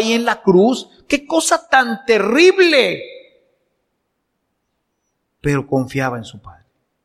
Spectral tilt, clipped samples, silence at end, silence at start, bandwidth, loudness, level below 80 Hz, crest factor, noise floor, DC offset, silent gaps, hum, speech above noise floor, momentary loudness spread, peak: -4.5 dB/octave; under 0.1%; 0.55 s; 0 s; 14.5 kHz; -15 LUFS; -50 dBFS; 18 dB; -71 dBFS; under 0.1%; none; none; 56 dB; 14 LU; 0 dBFS